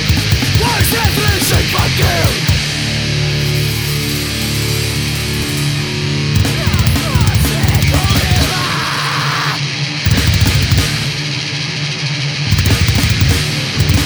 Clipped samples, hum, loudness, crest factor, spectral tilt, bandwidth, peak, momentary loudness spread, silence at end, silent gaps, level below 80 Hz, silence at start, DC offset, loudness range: under 0.1%; none; -14 LUFS; 14 dB; -4 dB/octave; over 20 kHz; 0 dBFS; 5 LU; 0 s; none; -24 dBFS; 0 s; under 0.1%; 3 LU